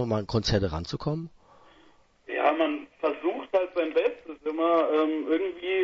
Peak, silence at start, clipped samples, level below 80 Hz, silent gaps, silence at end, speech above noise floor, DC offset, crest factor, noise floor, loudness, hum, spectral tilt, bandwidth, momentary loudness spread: -10 dBFS; 0 s; under 0.1%; -48 dBFS; none; 0 s; 33 dB; under 0.1%; 18 dB; -60 dBFS; -27 LUFS; none; -6.5 dB/octave; 7.6 kHz; 9 LU